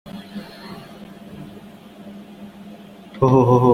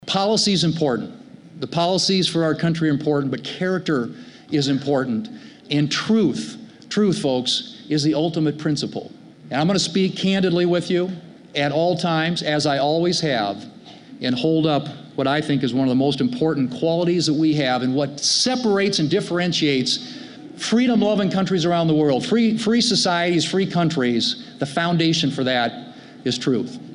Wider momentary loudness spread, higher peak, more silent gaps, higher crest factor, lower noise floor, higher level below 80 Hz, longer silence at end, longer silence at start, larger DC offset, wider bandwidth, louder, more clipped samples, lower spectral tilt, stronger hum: first, 26 LU vs 10 LU; first, -2 dBFS vs -6 dBFS; neither; first, 20 dB vs 14 dB; about the same, -41 dBFS vs -41 dBFS; first, -52 dBFS vs -60 dBFS; about the same, 0 s vs 0 s; about the same, 0.05 s vs 0 s; neither; first, 14.5 kHz vs 11 kHz; first, -16 LUFS vs -20 LUFS; neither; first, -9 dB/octave vs -5 dB/octave; neither